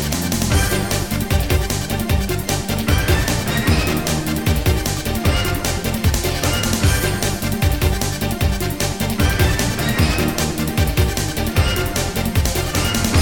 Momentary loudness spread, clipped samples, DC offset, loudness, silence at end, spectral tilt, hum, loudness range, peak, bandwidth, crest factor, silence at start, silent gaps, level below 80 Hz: 4 LU; under 0.1%; 0.6%; -19 LUFS; 0 s; -4.5 dB/octave; none; 1 LU; 0 dBFS; over 20 kHz; 16 dB; 0 s; none; -24 dBFS